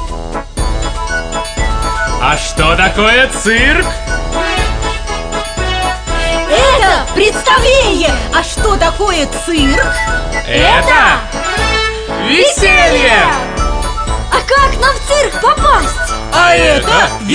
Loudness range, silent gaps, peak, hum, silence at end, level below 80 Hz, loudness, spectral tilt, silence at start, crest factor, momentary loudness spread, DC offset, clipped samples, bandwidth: 3 LU; none; 0 dBFS; none; 0 s; -18 dBFS; -11 LUFS; -3.5 dB/octave; 0 s; 12 dB; 10 LU; under 0.1%; under 0.1%; 10 kHz